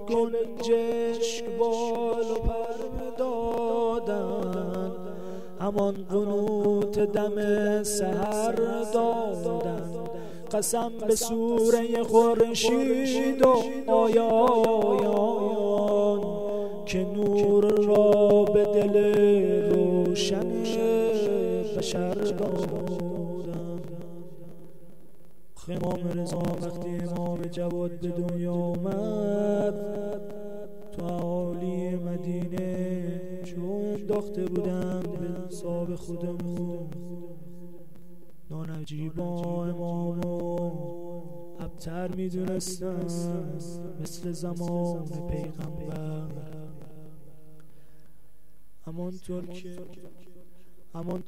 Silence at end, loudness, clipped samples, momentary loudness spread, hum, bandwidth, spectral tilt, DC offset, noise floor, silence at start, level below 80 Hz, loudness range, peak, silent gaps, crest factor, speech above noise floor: 0.05 s; -27 LUFS; under 0.1%; 17 LU; none; 16 kHz; -6 dB/octave; 1%; -62 dBFS; 0 s; -52 dBFS; 14 LU; -8 dBFS; none; 20 dB; 35 dB